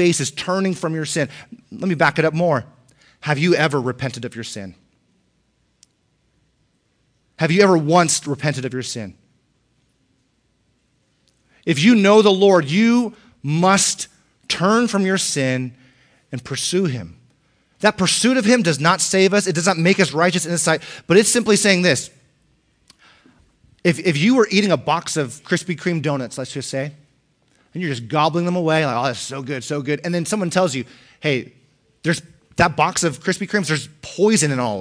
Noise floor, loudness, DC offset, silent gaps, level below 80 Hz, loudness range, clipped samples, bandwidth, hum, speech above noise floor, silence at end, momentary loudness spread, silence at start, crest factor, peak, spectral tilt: -65 dBFS; -18 LUFS; under 0.1%; none; -58 dBFS; 7 LU; under 0.1%; 10.5 kHz; none; 47 dB; 0 s; 14 LU; 0 s; 18 dB; -2 dBFS; -4.5 dB/octave